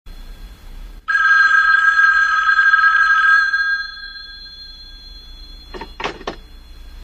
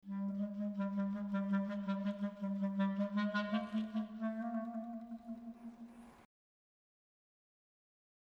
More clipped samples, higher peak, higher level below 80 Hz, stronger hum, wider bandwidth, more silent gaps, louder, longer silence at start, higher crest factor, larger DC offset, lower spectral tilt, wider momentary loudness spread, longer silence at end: neither; first, -2 dBFS vs -24 dBFS; first, -40 dBFS vs -76 dBFS; neither; first, 8.6 kHz vs 6.2 kHz; neither; first, -12 LUFS vs -40 LUFS; about the same, 0.05 s vs 0.05 s; about the same, 16 dB vs 16 dB; neither; second, -1.5 dB/octave vs -8.5 dB/octave; first, 23 LU vs 13 LU; second, 0 s vs 2.05 s